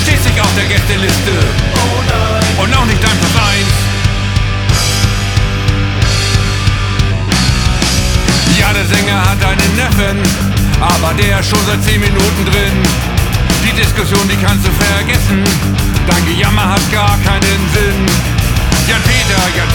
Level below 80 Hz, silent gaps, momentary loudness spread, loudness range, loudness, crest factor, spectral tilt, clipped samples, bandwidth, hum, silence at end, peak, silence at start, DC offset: -18 dBFS; none; 3 LU; 1 LU; -11 LUFS; 10 dB; -4.5 dB/octave; under 0.1%; 19.5 kHz; none; 0 s; 0 dBFS; 0 s; under 0.1%